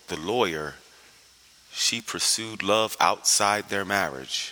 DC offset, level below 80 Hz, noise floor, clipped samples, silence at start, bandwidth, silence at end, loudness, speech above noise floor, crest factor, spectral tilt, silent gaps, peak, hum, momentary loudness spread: under 0.1%; -62 dBFS; -55 dBFS; under 0.1%; 0.1 s; over 20 kHz; 0 s; -24 LUFS; 30 dB; 22 dB; -1.5 dB/octave; none; -4 dBFS; none; 9 LU